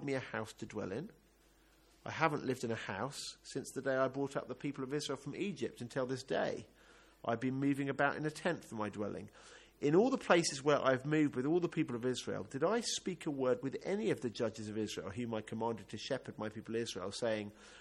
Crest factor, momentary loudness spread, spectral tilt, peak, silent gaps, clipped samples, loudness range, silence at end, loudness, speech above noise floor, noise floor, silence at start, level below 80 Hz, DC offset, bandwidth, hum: 24 dB; 12 LU; -5 dB/octave; -14 dBFS; none; under 0.1%; 7 LU; 0 s; -37 LUFS; 31 dB; -68 dBFS; 0 s; -72 dBFS; under 0.1%; 13 kHz; none